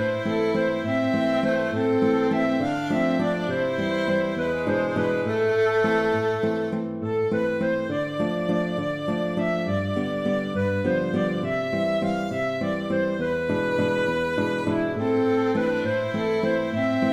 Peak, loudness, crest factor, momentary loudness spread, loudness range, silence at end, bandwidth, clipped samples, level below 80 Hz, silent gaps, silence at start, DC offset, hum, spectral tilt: -10 dBFS; -24 LUFS; 14 dB; 4 LU; 2 LU; 0 s; 13.5 kHz; under 0.1%; -56 dBFS; none; 0 s; under 0.1%; none; -7 dB/octave